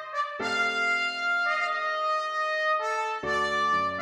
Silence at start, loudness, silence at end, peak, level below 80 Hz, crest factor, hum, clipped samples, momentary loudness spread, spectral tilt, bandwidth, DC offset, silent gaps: 0 s; -26 LUFS; 0 s; -16 dBFS; -62 dBFS; 12 dB; none; under 0.1%; 4 LU; -2.5 dB/octave; 13 kHz; under 0.1%; none